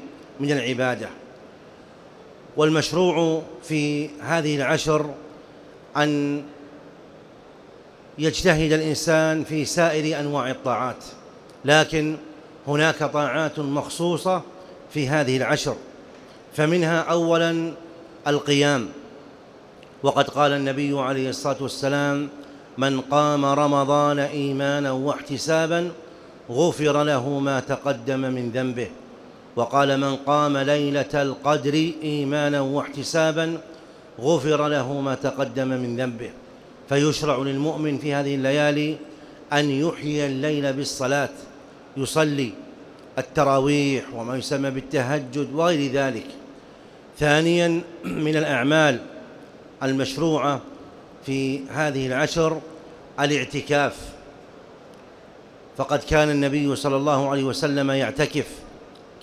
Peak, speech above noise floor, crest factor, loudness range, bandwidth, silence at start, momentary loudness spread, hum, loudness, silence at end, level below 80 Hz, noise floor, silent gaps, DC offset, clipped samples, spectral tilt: -2 dBFS; 24 dB; 20 dB; 3 LU; 15 kHz; 0 s; 15 LU; none; -23 LUFS; 0.05 s; -52 dBFS; -46 dBFS; none; under 0.1%; under 0.1%; -5 dB/octave